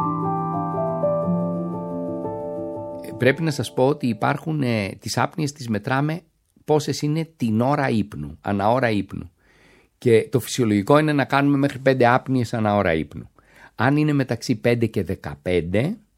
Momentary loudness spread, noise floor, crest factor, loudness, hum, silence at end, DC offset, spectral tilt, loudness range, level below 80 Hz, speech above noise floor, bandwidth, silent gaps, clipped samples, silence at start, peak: 11 LU; -55 dBFS; 20 dB; -22 LUFS; none; 0.2 s; under 0.1%; -6.5 dB/octave; 4 LU; -52 dBFS; 35 dB; 16.5 kHz; none; under 0.1%; 0 s; -2 dBFS